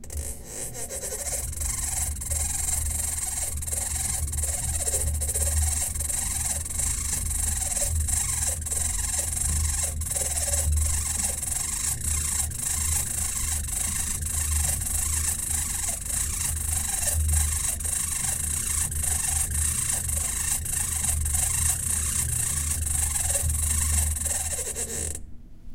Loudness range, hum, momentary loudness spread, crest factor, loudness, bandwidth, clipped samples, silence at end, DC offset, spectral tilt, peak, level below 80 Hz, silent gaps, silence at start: 2 LU; none; 4 LU; 18 dB; -25 LUFS; 16.5 kHz; under 0.1%; 0 s; under 0.1%; -2 dB/octave; -10 dBFS; -32 dBFS; none; 0 s